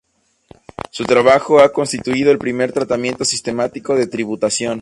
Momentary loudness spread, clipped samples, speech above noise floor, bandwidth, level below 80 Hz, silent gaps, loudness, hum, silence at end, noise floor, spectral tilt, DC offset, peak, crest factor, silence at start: 10 LU; under 0.1%; 33 dB; 11.5 kHz; -52 dBFS; none; -16 LUFS; none; 0 s; -48 dBFS; -4 dB/octave; under 0.1%; 0 dBFS; 16 dB; 0.95 s